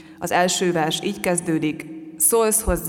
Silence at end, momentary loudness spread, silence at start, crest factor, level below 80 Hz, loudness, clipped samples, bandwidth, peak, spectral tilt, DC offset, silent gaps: 0 s; 9 LU; 0 s; 18 dB; -38 dBFS; -20 LUFS; under 0.1%; 18 kHz; -4 dBFS; -3.5 dB/octave; under 0.1%; none